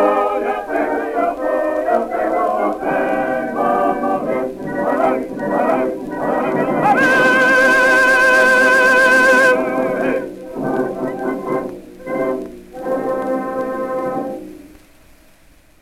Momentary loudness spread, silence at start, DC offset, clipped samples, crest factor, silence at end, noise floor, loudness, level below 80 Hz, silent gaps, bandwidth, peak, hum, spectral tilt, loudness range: 13 LU; 0 s; under 0.1%; under 0.1%; 14 dB; 1.15 s; -48 dBFS; -16 LUFS; -48 dBFS; none; 16 kHz; -2 dBFS; none; -4.5 dB/octave; 12 LU